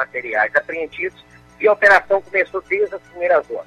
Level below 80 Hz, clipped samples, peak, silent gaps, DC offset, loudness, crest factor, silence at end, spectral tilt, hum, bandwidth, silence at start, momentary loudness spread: -56 dBFS; under 0.1%; -2 dBFS; none; under 0.1%; -18 LUFS; 18 dB; 0.05 s; -4 dB/octave; 60 Hz at -55 dBFS; 12.5 kHz; 0 s; 13 LU